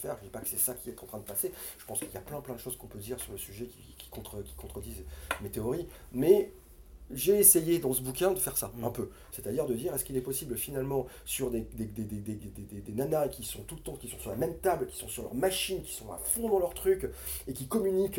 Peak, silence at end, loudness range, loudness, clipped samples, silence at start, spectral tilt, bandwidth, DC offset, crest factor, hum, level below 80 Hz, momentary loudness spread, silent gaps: -6 dBFS; 0 s; 13 LU; -31 LUFS; under 0.1%; 0 s; -4 dB/octave; 17 kHz; under 0.1%; 26 dB; none; -52 dBFS; 15 LU; none